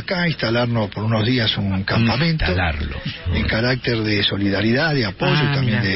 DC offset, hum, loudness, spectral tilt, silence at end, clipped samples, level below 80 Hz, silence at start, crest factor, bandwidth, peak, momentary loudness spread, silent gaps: under 0.1%; none; -19 LUFS; -9.5 dB/octave; 0 s; under 0.1%; -34 dBFS; 0 s; 12 dB; 5.8 kHz; -6 dBFS; 5 LU; none